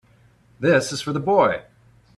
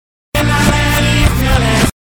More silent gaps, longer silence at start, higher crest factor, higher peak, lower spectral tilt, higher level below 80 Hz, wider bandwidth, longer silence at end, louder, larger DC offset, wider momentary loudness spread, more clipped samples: neither; first, 0.6 s vs 0.35 s; first, 18 dB vs 10 dB; about the same, -4 dBFS vs -2 dBFS; about the same, -5 dB/octave vs -4.5 dB/octave; second, -58 dBFS vs -18 dBFS; second, 13 kHz vs over 20 kHz; first, 0.55 s vs 0.25 s; second, -21 LUFS vs -12 LUFS; neither; first, 7 LU vs 3 LU; neither